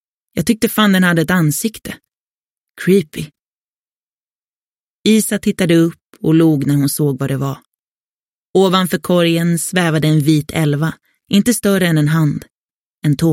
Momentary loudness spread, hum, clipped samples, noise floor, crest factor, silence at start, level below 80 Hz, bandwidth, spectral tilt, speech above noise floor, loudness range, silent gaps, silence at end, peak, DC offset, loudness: 10 LU; none; under 0.1%; under -90 dBFS; 16 dB; 0.35 s; -50 dBFS; 16.5 kHz; -5.5 dB/octave; over 76 dB; 5 LU; 2.17-2.75 s, 3.39-5.04 s, 6.01-6.10 s, 7.66-7.72 s, 7.79-8.54 s, 12.52-13.02 s; 0 s; 0 dBFS; under 0.1%; -15 LUFS